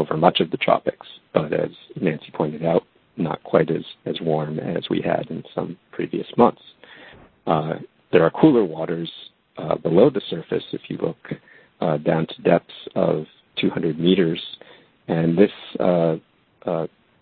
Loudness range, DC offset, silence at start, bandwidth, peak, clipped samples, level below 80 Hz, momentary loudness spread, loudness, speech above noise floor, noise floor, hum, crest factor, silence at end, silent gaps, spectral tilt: 4 LU; under 0.1%; 0 s; 4.6 kHz; 0 dBFS; under 0.1%; -58 dBFS; 14 LU; -22 LUFS; 26 dB; -47 dBFS; none; 22 dB; 0.35 s; none; -11 dB/octave